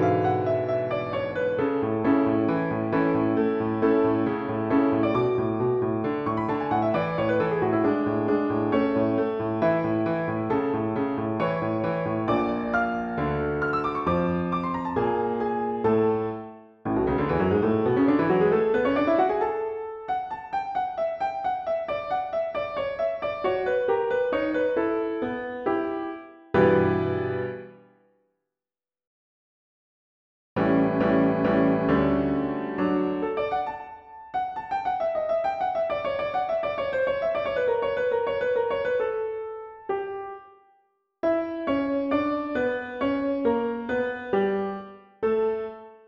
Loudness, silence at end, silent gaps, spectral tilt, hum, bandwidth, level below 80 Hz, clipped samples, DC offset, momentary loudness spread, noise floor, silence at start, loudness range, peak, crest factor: -25 LUFS; 0.1 s; 29.07-30.56 s; -9 dB/octave; none; 6.2 kHz; -52 dBFS; under 0.1%; under 0.1%; 8 LU; under -90 dBFS; 0 s; 5 LU; -8 dBFS; 18 dB